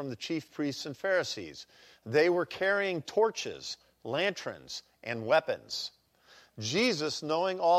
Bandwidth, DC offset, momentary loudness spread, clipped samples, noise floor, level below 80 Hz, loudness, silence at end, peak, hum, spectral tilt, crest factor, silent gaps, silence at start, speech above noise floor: 15 kHz; under 0.1%; 13 LU; under 0.1%; -61 dBFS; -74 dBFS; -31 LUFS; 0 s; -12 dBFS; none; -4 dB/octave; 18 dB; none; 0 s; 30 dB